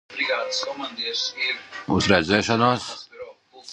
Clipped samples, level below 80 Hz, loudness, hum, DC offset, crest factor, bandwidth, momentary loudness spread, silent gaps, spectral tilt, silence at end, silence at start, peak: under 0.1%; -48 dBFS; -22 LUFS; none; under 0.1%; 22 dB; 11 kHz; 18 LU; none; -4 dB/octave; 0 s; 0.1 s; -2 dBFS